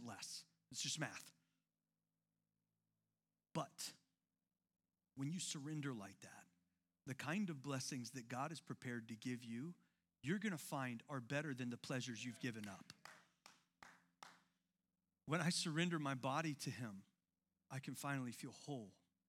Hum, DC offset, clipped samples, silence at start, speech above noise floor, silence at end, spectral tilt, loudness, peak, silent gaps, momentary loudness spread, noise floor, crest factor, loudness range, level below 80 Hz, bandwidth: none; under 0.1%; under 0.1%; 0 s; over 44 dB; 0.35 s; -4 dB/octave; -47 LUFS; -26 dBFS; none; 20 LU; under -90 dBFS; 22 dB; 9 LU; under -90 dBFS; 16.5 kHz